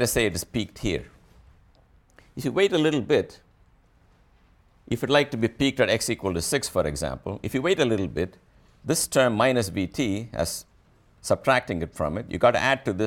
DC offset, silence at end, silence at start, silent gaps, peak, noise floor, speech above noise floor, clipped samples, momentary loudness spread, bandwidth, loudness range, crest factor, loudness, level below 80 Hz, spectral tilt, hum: under 0.1%; 0 s; 0 s; none; -6 dBFS; -59 dBFS; 35 dB; under 0.1%; 11 LU; 18 kHz; 3 LU; 18 dB; -25 LUFS; -48 dBFS; -4.5 dB/octave; none